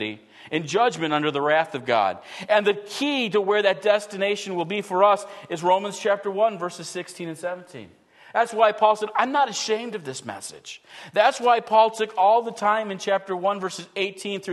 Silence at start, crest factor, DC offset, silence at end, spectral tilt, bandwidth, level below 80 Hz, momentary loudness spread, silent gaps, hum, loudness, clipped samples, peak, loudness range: 0 s; 20 dB; under 0.1%; 0 s; -3.5 dB/octave; 12.5 kHz; -78 dBFS; 14 LU; none; none; -23 LUFS; under 0.1%; -4 dBFS; 3 LU